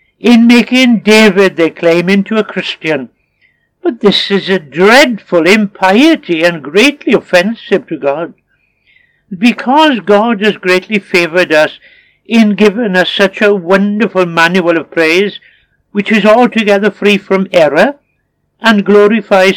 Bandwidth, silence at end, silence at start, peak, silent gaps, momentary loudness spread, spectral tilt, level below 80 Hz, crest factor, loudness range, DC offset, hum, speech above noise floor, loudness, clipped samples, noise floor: 18 kHz; 0 s; 0.25 s; 0 dBFS; none; 9 LU; -5 dB/octave; -54 dBFS; 10 dB; 4 LU; 0.2%; none; 53 dB; -9 LUFS; 1%; -61 dBFS